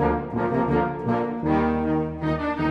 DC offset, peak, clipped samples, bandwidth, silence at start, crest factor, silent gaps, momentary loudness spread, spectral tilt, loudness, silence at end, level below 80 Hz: under 0.1%; -8 dBFS; under 0.1%; 6.2 kHz; 0 s; 14 dB; none; 3 LU; -9.5 dB/octave; -24 LUFS; 0 s; -40 dBFS